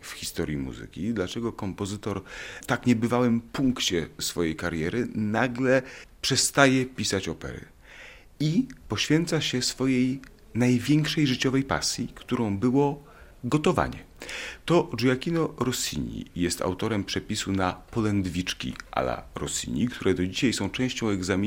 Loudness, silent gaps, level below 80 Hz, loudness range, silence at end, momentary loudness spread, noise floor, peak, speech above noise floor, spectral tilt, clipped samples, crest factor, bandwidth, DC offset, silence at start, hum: -26 LUFS; none; -50 dBFS; 4 LU; 0 s; 11 LU; -48 dBFS; -2 dBFS; 21 dB; -4.5 dB/octave; under 0.1%; 24 dB; 16.5 kHz; under 0.1%; 0 s; none